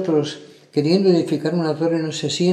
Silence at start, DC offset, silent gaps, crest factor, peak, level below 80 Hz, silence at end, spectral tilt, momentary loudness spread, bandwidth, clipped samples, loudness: 0 s; under 0.1%; none; 14 dB; -4 dBFS; -72 dBFS; 0 s; -6 dB/octave; 9 LU; 11.5 kHz; under 0.1%; -20 LUFS